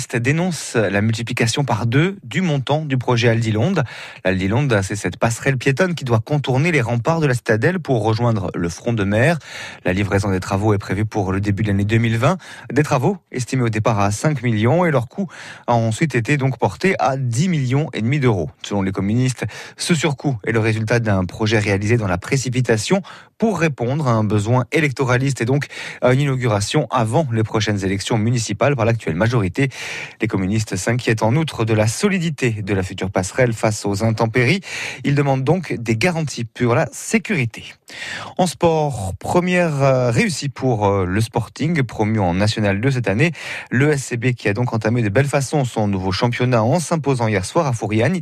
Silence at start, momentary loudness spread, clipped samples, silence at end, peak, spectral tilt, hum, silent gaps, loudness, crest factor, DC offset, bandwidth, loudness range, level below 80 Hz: 0 s; 5 LU; under 0.1%; 0 s; -2 dBFS; -6 dB/octave; none; none; -19 LUFS; 16 dB; under 0.1%; 13.5 kHz; 1 LU; -48 dBFS